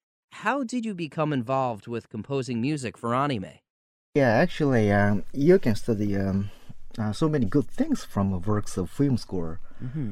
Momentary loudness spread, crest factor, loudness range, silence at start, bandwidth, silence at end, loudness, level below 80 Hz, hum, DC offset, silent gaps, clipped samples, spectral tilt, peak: 12 LU; 18 dB; 5 LU; 0.35 s; 14 kHz; 0 s; -26 LUFS; -44 dBFS; none; under 0.1%; 3.70-4.13 s; under 0.1%; -7 dB/octave; -8 dBFS